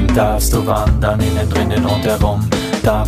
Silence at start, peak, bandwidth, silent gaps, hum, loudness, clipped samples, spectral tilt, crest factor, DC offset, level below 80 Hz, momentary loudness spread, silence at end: 0 s; 0 dBFS; 15.5 kHz; none; none; -15 LUFS; under 0.1%; -6 dB/octave; 14 dB; under 0.1%; -20 dBFS; 2 LU; 0 s